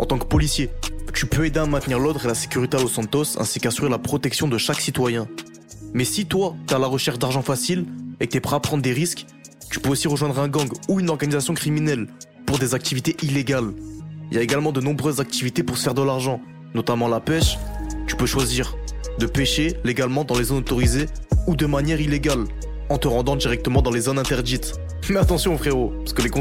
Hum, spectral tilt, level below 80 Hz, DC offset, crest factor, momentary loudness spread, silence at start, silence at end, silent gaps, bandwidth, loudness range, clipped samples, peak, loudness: none; -4.5 dB/octave; -32 dBFS; 0.1%; 16 dB; 9 LU; 0 s; 0 s; none; 16.5 kHz; 2 LU; under 0.1%; -4 dBFS; -22 LUFS